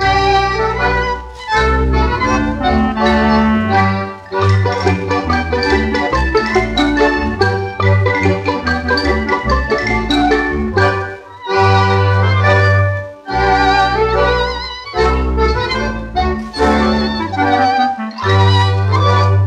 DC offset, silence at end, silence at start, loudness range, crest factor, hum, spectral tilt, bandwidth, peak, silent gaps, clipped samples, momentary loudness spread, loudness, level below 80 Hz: under 0.1%; 0 s; 0 s; 2 LU; 12 dB; none; -6.5 dB/octave; 9.2 kHz; -2 dBFS; none; under 0.1%; 6 LU; -14 LUFS; -24 dBFS